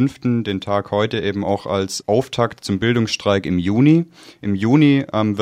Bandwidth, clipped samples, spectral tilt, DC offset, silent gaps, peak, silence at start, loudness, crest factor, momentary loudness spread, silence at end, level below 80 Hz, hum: 14 kHz; under 0.1%; -6.5 dB/octave; under 0.1%; none; -2 dBFS; 0 s; -18 LUFS; 16 dB; 8 LU; 0 s; -52 dBFS; none